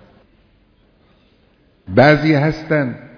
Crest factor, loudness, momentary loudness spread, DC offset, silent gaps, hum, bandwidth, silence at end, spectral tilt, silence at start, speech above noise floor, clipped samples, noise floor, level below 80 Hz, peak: 18 dB; -14 LUFS; 8 LU; under 0.1%; none; none; 5.4 kHz; 0.1 s; -8 dB/octave; 1.9 s; 41 dB; under 0.1%; -55 dBFS; -44 dBFS; 0 dBFS